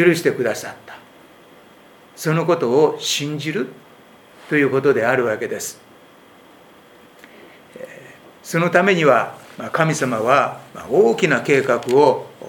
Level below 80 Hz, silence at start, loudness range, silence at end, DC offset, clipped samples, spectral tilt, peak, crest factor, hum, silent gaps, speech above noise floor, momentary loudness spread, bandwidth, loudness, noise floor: -66 dBFS; 0 s; 7 LU; 0 s; under 0.1%; under 0.1%; -5 dB/octave; 0 dBFS; 20 dB; none; none; 29 dB; 17 LU; 19 kHz; -18 LUFS; -47 dBFS